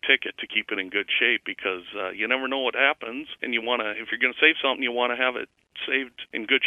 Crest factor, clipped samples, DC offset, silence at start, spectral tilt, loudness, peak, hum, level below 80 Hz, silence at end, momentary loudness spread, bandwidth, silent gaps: 22 dB; under 0.1%; under 0.1%; 0.05 s; -4 dB/octave; -24 LUFS; -4 dBFS; none; -70 dBFS; 0 s; 13 LU; 12.5 kHz; none